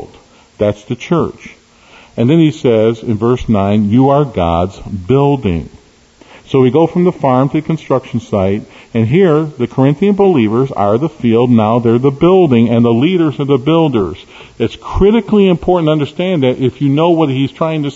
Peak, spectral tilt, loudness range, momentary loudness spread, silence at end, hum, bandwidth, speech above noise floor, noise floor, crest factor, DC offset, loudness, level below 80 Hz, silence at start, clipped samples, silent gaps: 0 dBFS; -8.5 dB/octave; 3 LU; 8 LU; 0 s; none; 8 kHz; 33 dB; -44 dBFS; 12 dB; under 0.1%; -12 LUFS; -36 dBFS; 0 s; under 0.1%; none